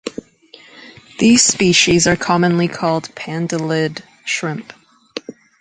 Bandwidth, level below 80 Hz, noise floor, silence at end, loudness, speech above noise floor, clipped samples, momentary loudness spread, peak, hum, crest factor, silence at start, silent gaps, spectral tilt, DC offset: 9.8 kHz; -48 dBFS; -45 dBFS; 0.3 s; -15 LUFS; 30 dB; under 0.1%; 20 LU; 0 dBFS; none; 18 dB; 0.05 s; none; -3.5 dB/octave; under 0.1%